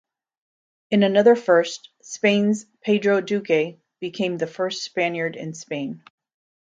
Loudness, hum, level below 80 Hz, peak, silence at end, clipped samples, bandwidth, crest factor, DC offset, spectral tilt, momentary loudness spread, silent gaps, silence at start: -21 LUFS; none; -72 dBFS; -4 dBFS; 0.75 s; under 0.1%; 9 kHz; 18 dB; under 0.1%; -5 dB/octave; 17 LU; none; 0.9 s